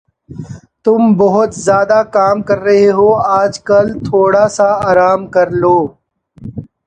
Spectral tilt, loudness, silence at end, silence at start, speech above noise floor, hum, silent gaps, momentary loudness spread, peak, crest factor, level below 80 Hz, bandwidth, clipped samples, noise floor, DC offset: -6.5 dB/octave; -11 LUFS; 0.25 s; 0.3 s; 22 dB; none; none; 19 LU; 0 dBFS; 12 dB; -46 dBFS; 9.6 kHz; under 0.1%; -33 dBFS; under 0.1%